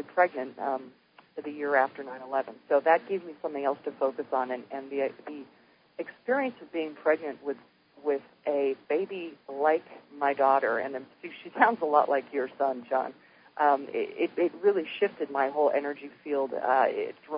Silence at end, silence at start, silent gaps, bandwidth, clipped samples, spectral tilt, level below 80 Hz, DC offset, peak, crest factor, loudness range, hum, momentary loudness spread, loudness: 0 s; 0 s; none; 5.2 kHz; under 0.1%; -8.5 dB/octave; -84 dBFS; under 0.1%; -6 dBFS; 24 dB; 5 LU; none; 15 LU; -29 LUFS